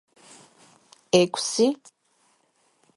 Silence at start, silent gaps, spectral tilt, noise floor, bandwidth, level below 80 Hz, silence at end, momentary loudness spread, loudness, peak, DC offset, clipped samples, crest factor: 1.15 s; none; -4 dB/octave; -67 dBFS; 11.5 kHz; -68 dBFS; 1.2 s; 5 LU; -22 LUFS; -6 dBFS; under 0.1%; under 0.1%; 22 dB